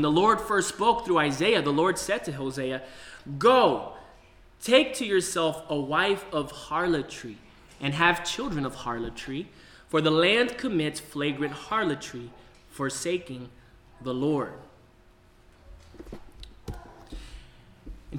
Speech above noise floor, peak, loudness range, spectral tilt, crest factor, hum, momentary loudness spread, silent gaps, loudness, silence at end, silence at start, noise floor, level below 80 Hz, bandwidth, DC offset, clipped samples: 31 dB; -8 dBFS; 11 LU; -4 dB/octave; 20 dB; none; 22 LU; none; -26 LUFS; 0 s; 0 s; -57 dBFS; -52 dBFS; 18.5 kHz; under 0.1%; under 0.1%